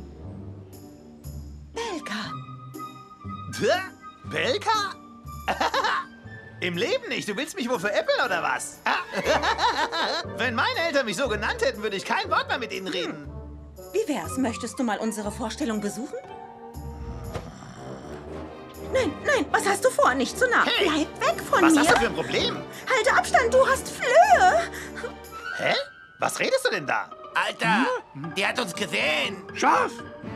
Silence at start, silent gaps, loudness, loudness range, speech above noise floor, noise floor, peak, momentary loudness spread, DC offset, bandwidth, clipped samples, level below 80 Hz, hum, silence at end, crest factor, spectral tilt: 0 s; none; -24 LUFS; 10 LU; 21 dB; -45 dBFS; -4 dBFS; 20 LU; under 0.1%; 15.5 kHz; under 0.1%; -48 dBFS; none; 0 s; 22 dB; -3.5 dB/octave